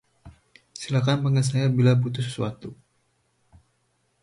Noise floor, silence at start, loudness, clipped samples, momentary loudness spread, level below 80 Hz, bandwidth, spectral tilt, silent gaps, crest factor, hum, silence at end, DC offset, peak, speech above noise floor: -70 dBFS; 0.25 s; -23 LUFS; under 0.1%; 20 LU; -58 dBFS; 11.5 kHz; -6.5 dB/octave; none; 18 dB; none; 1.5 s; under 0.1%; -8 dBFS; 48 dB